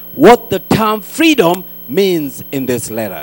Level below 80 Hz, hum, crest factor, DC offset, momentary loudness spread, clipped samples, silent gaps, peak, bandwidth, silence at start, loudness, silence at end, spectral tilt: -42 dBFS; none; 12 dB; under 0.1%; 12 LU; 0.8%; none; 0 dBFS; 19 kHz; 0 s; -13 LUFS; 0 s; -5 dB/octave